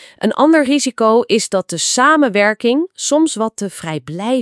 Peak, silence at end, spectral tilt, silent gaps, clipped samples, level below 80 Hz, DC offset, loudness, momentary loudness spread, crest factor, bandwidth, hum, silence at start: 0 dBFS; 0 s; -3.5 dB/octave; none; under 0.1%; -64 dBFS; under 0.1%; -14 LUFS; 11 LU; 14 dB; 12 kHz; none; 0 s